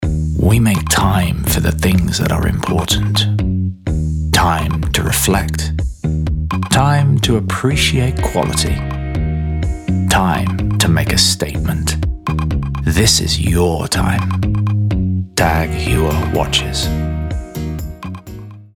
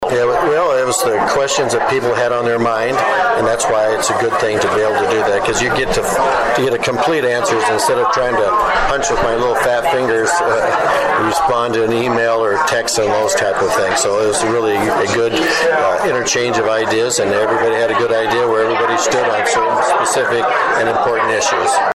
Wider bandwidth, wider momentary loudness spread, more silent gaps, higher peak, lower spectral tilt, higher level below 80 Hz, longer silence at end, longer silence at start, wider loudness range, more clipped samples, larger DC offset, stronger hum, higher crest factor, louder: first, 19 kHz vs 14.5 kHz; first, 8 LU vs 1 LU; neither; first, 0 dBFS vs -6 dBFS; first, -4.5 dB/octave vs -3 dB/octave; first, -24 dBFS vs -40 dBFS; about the same, 0.1 s vs 0 s; about the same, 0 s vs 0 s; about the same, 2 LU vs 1 LU; neither; neither; neither; first, 14 dB vs 8 dB; about the same, -16 LUFS vs -14 LUFS